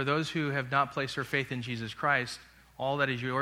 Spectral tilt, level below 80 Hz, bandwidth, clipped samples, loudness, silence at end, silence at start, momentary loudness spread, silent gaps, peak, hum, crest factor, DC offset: -5.5 dB/octave; -64 dBFS; 16 kHz; under 0.1%; -31 LUFS; 0 s; 0 s; 8 LU; none; -12 dBFS; none; 20 dB; under 0.1%